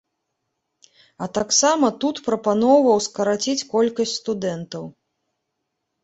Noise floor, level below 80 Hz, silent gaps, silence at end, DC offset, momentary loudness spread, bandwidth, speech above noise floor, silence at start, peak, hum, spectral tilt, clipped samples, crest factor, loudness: -78 dBFS; -62 dBFS; none; 1.15 s; under 0.1%; 15 LU; 8.2 kHz; 58 dB; 1.2 s; -4 dBFS; none; -3.5 dB/octave; under 0.1%; 18 dB; -20 LUFS